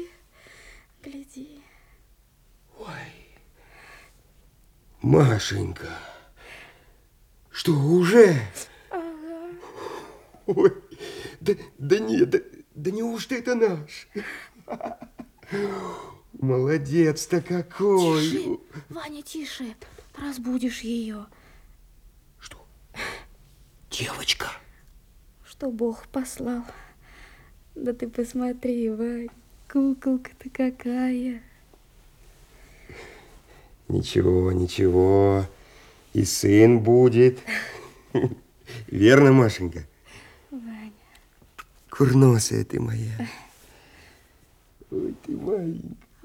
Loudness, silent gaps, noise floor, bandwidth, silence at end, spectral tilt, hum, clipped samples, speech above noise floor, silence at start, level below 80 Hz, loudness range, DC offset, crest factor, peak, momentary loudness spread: -23 LUFS; none; -58 dBFS; 16.5 kHz; 0.3 s; -6 dB/octave; none; under 0.1%; 36 dB; 0 s; -54 dBFS; 13 LU; under 0.1%; 24 dB; -2 dBFS; 24 LU